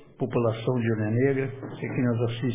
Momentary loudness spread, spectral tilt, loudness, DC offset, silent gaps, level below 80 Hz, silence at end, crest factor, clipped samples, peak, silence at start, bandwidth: 7 LU; -12 dB/octave; -27 LUFS; under 0.1%; none; -58 dBFS; 0 s; 16 dB; under 0.1%; -10 dBFS; 0 s; 3.8 kHz